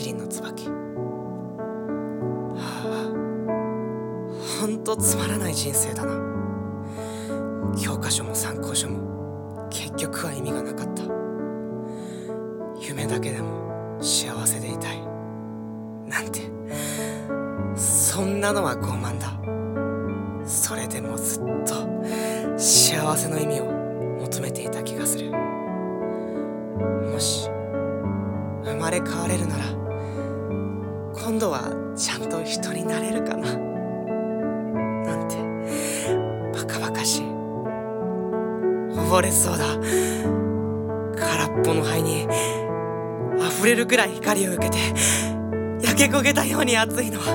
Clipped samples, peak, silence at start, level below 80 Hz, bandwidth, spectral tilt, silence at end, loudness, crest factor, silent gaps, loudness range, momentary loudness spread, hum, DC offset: under 0.1%; -2 dBFS; 0 s; -56 dBFS; 17 kHz; -3.5 dB/octave; 0 s; -24 LUFS; 24 dB; none; 7 LU; 12 LU; none; under 0.1%